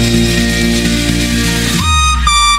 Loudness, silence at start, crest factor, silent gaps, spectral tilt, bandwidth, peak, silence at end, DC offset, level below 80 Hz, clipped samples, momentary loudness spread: -11 LUFS; 0 s; 12 dB; none; -3.5 dB/octave; 16.5 kHz; 0 dBFS; 0 s; under 0.1%; -18 dBFS; under 0.1%; 3 LU